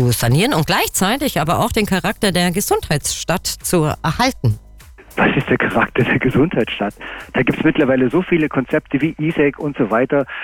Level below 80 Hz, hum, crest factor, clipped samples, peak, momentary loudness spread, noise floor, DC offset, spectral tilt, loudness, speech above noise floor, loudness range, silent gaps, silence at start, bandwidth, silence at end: -38 dBFS; none; 12 dB; under 0.1%; -4 dBFS; 5 LU; -41 dBFS; under 0.1%; -5 dB/octave; -17 LUFS; 24 dB; 2 LU; none; 0 s; over 20 kHz; 0 s